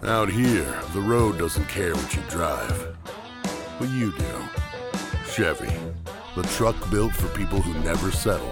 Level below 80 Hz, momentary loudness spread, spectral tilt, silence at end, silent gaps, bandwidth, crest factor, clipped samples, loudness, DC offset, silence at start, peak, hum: -34 dBFS; 10 LU; -5 dB/octave; 0 s; none; 18 kHz; 18 dB; under 0.1%; -26 LUFS; under 0.1%; 0 s; -8 dBFS; none